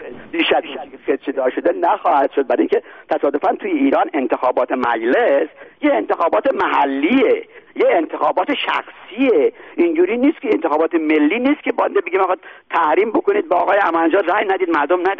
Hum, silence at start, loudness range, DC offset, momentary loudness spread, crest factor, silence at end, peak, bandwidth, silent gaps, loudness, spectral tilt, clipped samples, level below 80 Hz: none; 0 s; 1 LU; 0.1%; 6 LU; 14 dB; 0 s; -4 dBFS; 5.8 kHz; none; -17 LUFS; -1.5 dB/octave; under 0.1%; -62 dBFS